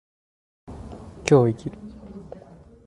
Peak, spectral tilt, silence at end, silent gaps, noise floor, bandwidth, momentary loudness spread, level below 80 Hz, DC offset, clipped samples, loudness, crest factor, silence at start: -4 dBFS; -7 dB/octave; 0.65 s; none; -47 dBFS; 11.5 kHz; 25 LU; -50 dBFS; under 0.1%; under 0.1%; -21 LUFS; 22 dB; 0.7 s